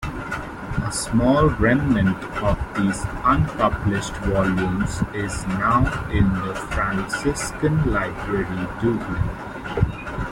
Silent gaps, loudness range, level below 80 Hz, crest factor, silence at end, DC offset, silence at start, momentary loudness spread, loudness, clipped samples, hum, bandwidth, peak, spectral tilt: none; 3 LU; -32 dBFS; 16 dB; 0 s; under 0.1%; 0 s; 9 LU; -22 LUFS; under 0.1%; none; 16.5 kHz; -4 dBFS; -6 dB/octave